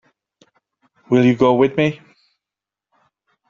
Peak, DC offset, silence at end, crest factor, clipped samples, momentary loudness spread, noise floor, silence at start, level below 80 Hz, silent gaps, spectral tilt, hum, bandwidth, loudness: -2 dBFS; under 0.1%; 1.55 s; 18 dB; under 0.1%; 7 LU; -87 dBFS; 1.1 s; -58 dBFS; none; -6 dB/octave; none; 7.2 kHz; -16 LUFS